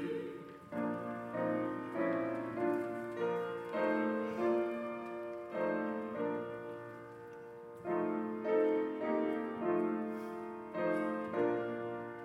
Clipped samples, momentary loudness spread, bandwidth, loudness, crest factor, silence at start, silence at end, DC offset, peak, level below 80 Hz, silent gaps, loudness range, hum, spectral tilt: under 0.1%; 11 LU; 12.5 kHz; -37 LUFS; 16 dB; 0 s; 0 s; under 0.1%; -20 dBFS; -78 dBFS; none; 4 LU; none; -8 dB/octave